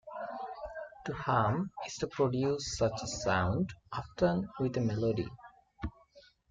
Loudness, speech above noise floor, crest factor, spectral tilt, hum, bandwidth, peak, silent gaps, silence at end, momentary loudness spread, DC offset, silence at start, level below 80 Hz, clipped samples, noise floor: -34 LUFS; 29 dB; 18 dB; -5.5 dB/octave; none; 9.4 kHz; -16 dBFS; none; 0.3 s; 13 LU; under 0.1%; 0.05 s; -54 dBFS; under 0.1%; -62 dBFS